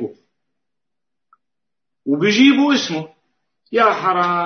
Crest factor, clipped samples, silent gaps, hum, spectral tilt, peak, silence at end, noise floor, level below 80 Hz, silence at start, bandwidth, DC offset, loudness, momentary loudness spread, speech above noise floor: 18 dB; under 0.1%; none; none; -4.5 dB/octave; 0 dBFS; 0 s; -84 dBFS; -70 dBFS; 0 s; 6.6 kHz; under 0.1%; -16 LUFS; 18 LU; 69 dB